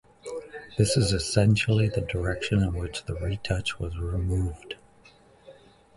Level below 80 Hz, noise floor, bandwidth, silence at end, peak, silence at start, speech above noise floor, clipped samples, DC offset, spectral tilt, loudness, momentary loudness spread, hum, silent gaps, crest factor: -38 dBFS; -56 dBFS; 11.5 kHz; 0.45 s; -6 dBFS; 0.25 s; 30 dB; under 0.1%; under 0.1%; -5.5 dB/octave; -26 LUFS; 16 LU; none; none; 20 dB